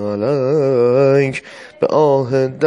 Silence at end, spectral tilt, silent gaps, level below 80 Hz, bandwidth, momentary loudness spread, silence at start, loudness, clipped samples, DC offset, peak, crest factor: 0 s; -7.5 dB/octave; none; -60 dBFS; 10.5 kHz; 8 LU; 0 s; -15 LUFS; under 0.1%; under 0.1%; -2 dBFS; 14 dB